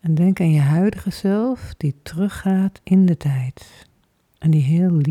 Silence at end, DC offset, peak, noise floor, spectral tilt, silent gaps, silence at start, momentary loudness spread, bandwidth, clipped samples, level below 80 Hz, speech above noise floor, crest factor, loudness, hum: 0 s; under 0.1%; -6 dBFS; -62 dBFS; -8.5 dB/octave; none; 0.05 s; 9 LU; 13 kHz; under 0.1%; -48 dBFS; 44 dB; 12 dB; -19 LUFS; none